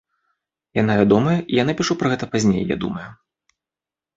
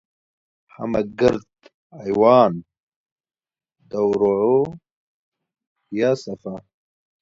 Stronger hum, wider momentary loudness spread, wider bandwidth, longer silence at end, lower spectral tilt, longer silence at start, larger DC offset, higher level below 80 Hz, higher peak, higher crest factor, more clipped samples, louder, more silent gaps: neither; second, 11 LU vs 18 LU; about the same, 8 kHz vs 7.6 kHz; first, 1 s vs 0.6 s; second, -6 dB/octave vs -7.5 dB/octave; about the same, 0.75 s vs 0.8 s; neither; about the same, -50 dBFS vs -54 dBFS; about the same, -2 dBFS vs -2 dBFS; about the same, 18 dB vs 22 dB; neither; about the same, -19 LUFS vs -19 LUFS; second, none vs 1.74-1.90 s, 2.80-3.06 s, 3.12-3.16 s, 4.91-5.32 s, 5.67-5.76 s